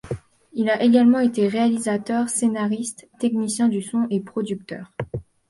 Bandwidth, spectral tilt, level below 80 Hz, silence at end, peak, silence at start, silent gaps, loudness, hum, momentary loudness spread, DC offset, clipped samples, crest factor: 11.5 kHz; -5 dB/octave; -54 dBFS; 0.3 s; -6 dBFS; 0.05 s; none; -21 LUFS; none; 16 LU; under 0.1%; under 0.1%; 16 dB